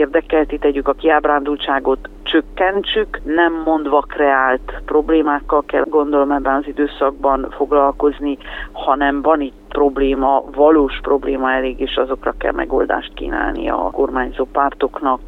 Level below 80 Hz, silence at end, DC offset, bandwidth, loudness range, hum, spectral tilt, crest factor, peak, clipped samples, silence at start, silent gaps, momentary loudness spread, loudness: -34 dBFS; 0 s; under 0.1%; 4.2 kHz; 3 LU; none; -7 dB/octave; 16 dB; 0 dBFS; under 0.1%; 0 s; none; 6 LU; -17 LUFS